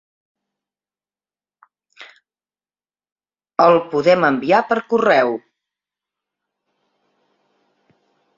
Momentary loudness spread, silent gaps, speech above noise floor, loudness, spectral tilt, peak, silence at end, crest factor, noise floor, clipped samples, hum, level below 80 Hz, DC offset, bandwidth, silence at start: 8 LU; 3.12-3.16 s; over 75 dB; -16 LUFS; -6 dB/octave; -2 dBFS; 3 s; 20 dB; under -90 dBFS; under 0.1%; 50 Hz at -60 dBFS; -66 dBFS; under 0.1%; 7.4 kHz; 2 s